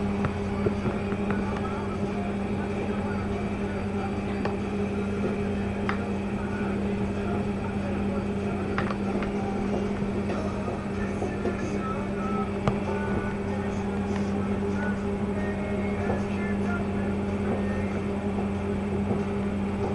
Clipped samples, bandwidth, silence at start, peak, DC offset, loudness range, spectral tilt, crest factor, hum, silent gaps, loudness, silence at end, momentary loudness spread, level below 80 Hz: under 0.1%; 11 kHz; 0 s; -8 dBFS; under 0.1%; 1 LU; -7.5 dB/octave; 20 dB; none; none; -29 LUFS; 0 s; 2 LU; -42 dBFS